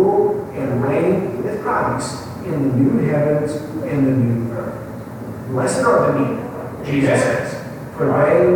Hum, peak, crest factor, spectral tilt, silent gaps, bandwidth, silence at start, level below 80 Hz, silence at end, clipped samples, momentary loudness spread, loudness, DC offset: none; -4 dBFS; 14 dB; -7 dB/octave; none; 19 kHz; 0 s; -48 dBFS; 0 s; under 0.1%; 13 LU; -19 LUFS; under 0.1%